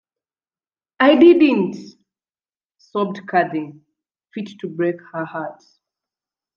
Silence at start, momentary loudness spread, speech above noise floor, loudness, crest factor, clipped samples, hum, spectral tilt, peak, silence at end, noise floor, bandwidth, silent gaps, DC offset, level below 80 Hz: 1 s; 21 LU; over 73 dB; -17 LUFS; 20 dB; under 0.1%; none; -7.5 dB/octave; 0 dBFS; 1.05 s; under -90 dBFS; 6.8 kHz; 2.66-2.70 s; under 0.1%; -68 dBFS